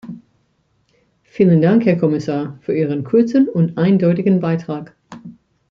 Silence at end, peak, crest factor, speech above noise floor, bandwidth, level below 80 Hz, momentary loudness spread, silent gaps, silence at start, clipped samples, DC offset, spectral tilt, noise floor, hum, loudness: 0.4 s; -2 dBFS; 14 dB; 48 dB; 7 kHz; -60 dBFS; 24 LU; none; 0.05 s; under 0.1%; under 0.1%; -9.5 dB/octave; -63 dBFS; none; -16 LUFS